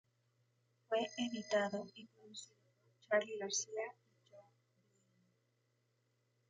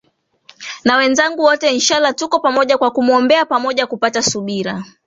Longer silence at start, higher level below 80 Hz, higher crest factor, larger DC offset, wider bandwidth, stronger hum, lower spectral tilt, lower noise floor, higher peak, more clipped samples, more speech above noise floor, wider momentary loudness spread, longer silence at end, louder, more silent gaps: first, 0.9 s vs 0.6 s; second, -90 dBFS vs -58 dBFS; first, 24 dB vs 16 dB; neither; first, 9.6 kHz vs 8 kHz; neither; about the same, -2.5 dB/octave vs -2.5 dB/octave; first, -81 dBFS vs -49 dBFS; second, -22 dBFS vs 0 dBFS; neither; first, 40 dB vs 34 dB; first, 16 LU vs 8 LU; first, 2.1 s vs 0.2 s; second, -40 LUFS vs -14 LUFS; neither